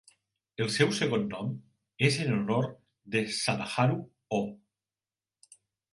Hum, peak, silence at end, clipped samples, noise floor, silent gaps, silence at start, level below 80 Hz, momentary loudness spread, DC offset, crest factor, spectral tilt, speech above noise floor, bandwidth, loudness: none; -10 dBFS; 1.35 s; under 0.1%; under -90 dBFS; none; 0.6 s; -68 dBFS; 11 LU; under 0.1%; 22 dB; -5 dB/octave; over 61 dB; 11.5 kHz; -30 LUFS